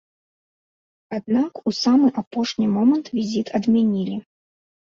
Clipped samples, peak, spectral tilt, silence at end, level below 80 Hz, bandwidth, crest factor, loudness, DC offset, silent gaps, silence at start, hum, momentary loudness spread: under 0.1%; -6 dBFS; -6 dB/octave; 0.65 s; -64 dBFS; 7.4 kHz; 16 dB; -21 LUFS; under 0.1%; 2.27-2.31 s; 1.1 s; none; 10 LU